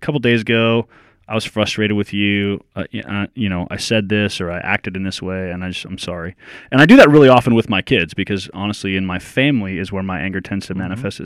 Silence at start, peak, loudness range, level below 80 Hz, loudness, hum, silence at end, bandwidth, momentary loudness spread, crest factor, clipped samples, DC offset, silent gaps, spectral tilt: 0 s; 0 dBFS; 8 LU; -46 dBFS; -16 LUFS; none; 0 s; 14.5 kHz; 16 LU; 16 dB; 0.4%; under 0.1%; none; -6 dB/octave